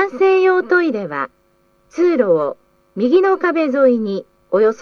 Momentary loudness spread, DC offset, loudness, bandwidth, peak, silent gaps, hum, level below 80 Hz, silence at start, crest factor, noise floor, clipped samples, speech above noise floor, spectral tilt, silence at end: 11 LU; under 0.1%; -16 LUFS; 6.6 kHz; -2 dBFS; none; none; -64 dBFS; 0 s; 14 dB; -58 dBFS; under 0.1%; 42 dB; -7 dB/octave; 0 s